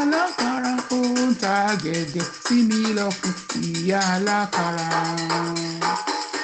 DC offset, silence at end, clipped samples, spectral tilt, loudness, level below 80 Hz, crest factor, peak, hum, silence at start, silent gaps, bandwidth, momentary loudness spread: under 0.1%; 0 s; under 0.1%; -4 dB/octave; -22 LUFS; -62 dBFS; 14 dB; -8 dBFS; none; 0 s; none; 9.2 kHz; 6 LU